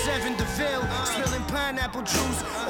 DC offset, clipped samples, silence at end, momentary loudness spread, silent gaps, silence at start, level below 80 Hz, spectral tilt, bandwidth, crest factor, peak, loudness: under 0.1%; under 0.1%; 0 s; 2 LU; none; 0 s; -38 dBFS; -3.5 dB/octave; 17.5 kHz; 16 dB; -12 dBFS; -27 LUFS